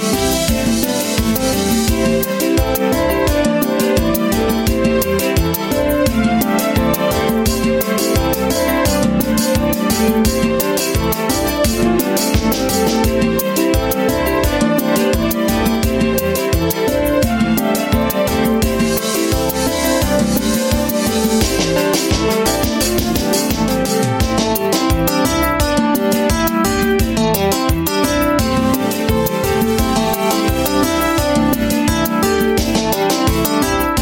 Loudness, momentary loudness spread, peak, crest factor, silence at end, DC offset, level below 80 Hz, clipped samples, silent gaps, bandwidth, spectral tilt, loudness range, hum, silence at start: -15 LUFS; 1 LU; -2 dBFS; 12 dB; 0 s; under 0.1%; -26 dBFS; under 0.1%; none; 17 kHz; -4.5 dB/octave; 1 LU; none; 0 s